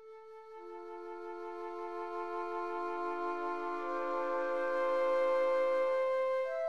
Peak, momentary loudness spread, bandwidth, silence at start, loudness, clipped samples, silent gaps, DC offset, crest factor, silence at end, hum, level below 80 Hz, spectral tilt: -22 dBFS; 16 LU; 7.6 kHz; 0 s; -35 LUFS; under 0.1%; none; 0.3%; 12 dB; 0 s; none; -82 dBFS; -4.5 dB/octave